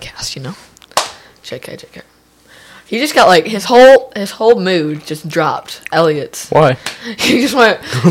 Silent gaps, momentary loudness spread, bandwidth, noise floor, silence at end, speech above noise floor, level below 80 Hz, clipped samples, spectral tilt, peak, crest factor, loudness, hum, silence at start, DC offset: none; 20 LU; 16.5 kHz; -44 dBFS; 0 s; 32 dB; -50 dBFS; under 0.1%; -4.5 dB/octave; 0 dBFS; 14 dB; -12 LUFS; none; 0 s; under 0.1%